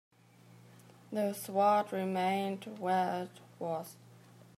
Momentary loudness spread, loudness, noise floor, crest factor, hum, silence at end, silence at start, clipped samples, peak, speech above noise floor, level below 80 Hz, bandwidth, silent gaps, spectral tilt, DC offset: 13 LU; -34 LUFS; -60 dBFS; 18 dB; none; 0.4 s; 1.1 s; under 0.1%; -18 dBFS; 27 dB; -88 dBFS; 15.5 kHz; none; -5.5 dB/octave; under 0.1%